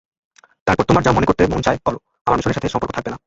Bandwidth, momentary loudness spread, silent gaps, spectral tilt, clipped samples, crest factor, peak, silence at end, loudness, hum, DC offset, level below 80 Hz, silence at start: 8 kHz; 10 LU; 2.21-2.25 s; -6.5 dB/octave; under 0.1%; 18 dB; -2 dBFS; 0.1 s; -18 LUFS; none; under 0.1%; -36 dBFS; 0.65 s